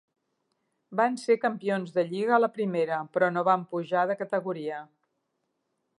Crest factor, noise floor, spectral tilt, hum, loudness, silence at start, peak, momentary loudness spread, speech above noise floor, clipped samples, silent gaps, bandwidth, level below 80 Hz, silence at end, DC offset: 20 dB; -79 dBFS; -6.5 dB/octave; none; -27 LUFS; 0.9 s; -8 dBFS; 9 LU; 52 dB; under 0.1%; none; 11 kHz; -86 dBFS; 1.15 s; under 0.1%